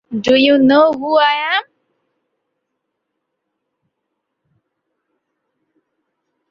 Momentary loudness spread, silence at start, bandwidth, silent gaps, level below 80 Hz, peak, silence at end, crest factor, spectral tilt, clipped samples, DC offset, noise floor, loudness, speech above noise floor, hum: 7 LU; 0.1 s; 7.2 kHz; none; -60 dBFS; -2 dBFS; 4.9 s; 16 dB; -5 dB/octave; under 0.1%; under 0.1%; -75 dBFS; -13 LUFS; 63 dB; none